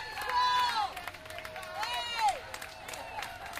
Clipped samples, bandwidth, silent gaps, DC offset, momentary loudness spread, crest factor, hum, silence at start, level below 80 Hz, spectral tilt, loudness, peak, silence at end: under 0.1%; 16 kHz; none; under 0.1%; 14 LU; 16 dB; none; 0 s; -60 dBFS; -1 dB/octave; -33 LUFS; -18 dBFS; 0 s